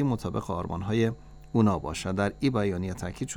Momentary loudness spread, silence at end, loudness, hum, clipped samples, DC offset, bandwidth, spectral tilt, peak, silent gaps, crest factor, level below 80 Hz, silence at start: 8 LU; 0 s; -29 LUFS; none; under 0.1%; under 0.1%; 16.5 kHz; -6.5 dB/octave; -10 dBFS; none; 18 dB; -48 dBFS; 0 s